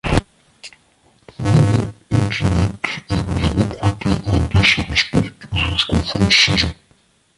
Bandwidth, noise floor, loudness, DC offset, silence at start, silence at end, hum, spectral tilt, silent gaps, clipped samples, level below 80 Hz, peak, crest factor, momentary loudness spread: 11.5 kHz; -57 dBFS; -17 LUFS; under 0.1%; 0.05 s; 0.65 s; none; -5 dB/octave; none; under 0.1%; -30 dBFS; 0 dBFS; 18 dB; 8 LU